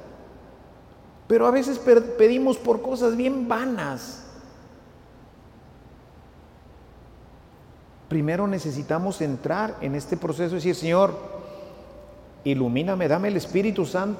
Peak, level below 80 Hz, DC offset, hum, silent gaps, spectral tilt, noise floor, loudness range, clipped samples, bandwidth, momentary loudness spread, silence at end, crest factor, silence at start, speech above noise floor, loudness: -6 dBFS; -54 dBFS; under 0.1%; none; none; -6.5 dB/octave; -49 dBFS; 11 LU; under 0.1%; 16.5 kHz; 20 LU; 0 s; 20 dB; 0 s; 27 dB; -23 LUFS